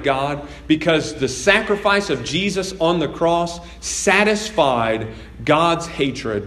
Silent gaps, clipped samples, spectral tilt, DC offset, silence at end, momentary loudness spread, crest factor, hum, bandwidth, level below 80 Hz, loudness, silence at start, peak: none; under 0.1%; -4 dB/octave; under 0.1%; 0 s; 9 LU; 18 dB; none; 13.5 kHz; -42 dBFS; -18 LUFS; 0 s; 0 dBFS